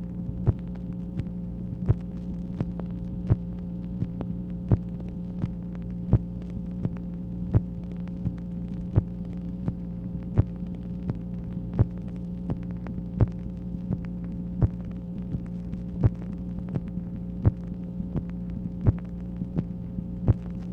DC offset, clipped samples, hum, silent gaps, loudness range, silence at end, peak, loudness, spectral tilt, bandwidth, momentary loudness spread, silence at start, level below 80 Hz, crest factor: under 0.1%; under 0.1%; none; none; 1 LU; 0 s; -6 dBFS; -31 LUFS; -11.5 dB/octave; 4 kHz; 8 LU; 0 s; -38 dBFS; 24 dB